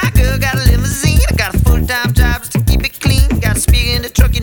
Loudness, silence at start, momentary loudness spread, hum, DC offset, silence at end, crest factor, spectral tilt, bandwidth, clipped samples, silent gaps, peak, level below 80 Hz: -13 LUFS; 0 s; 2 LU; none; under 0.1%; 0 s; 12 dB; -4.5 dB/octave; over 20 kHz; under 0.1%; none; 0 dBFS; -14 dBFS